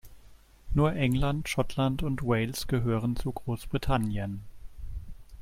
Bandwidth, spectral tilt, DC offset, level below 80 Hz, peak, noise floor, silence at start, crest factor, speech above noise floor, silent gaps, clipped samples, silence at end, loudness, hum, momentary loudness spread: 16.5 kHz; -6.5 dB/octave; under 0.1%; -40 dBFS; -12 dBFS; -53 dBFS; 0.05 s; 18 dB; 25 dB; none; under 0.1%; 0 s; -30 LUFS; none; 17 LU